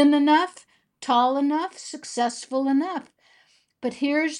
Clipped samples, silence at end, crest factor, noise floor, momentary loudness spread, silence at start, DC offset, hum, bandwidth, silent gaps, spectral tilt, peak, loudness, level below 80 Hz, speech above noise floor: under 0.1%; 0 s; 18 dB; -61 dBFS; 13 LU; 0 s; under 0.1%; none; 11 kHz; none; -3 dB/octave; -6 dBFS; -23 LUFS; -80 dBFS; 39 dB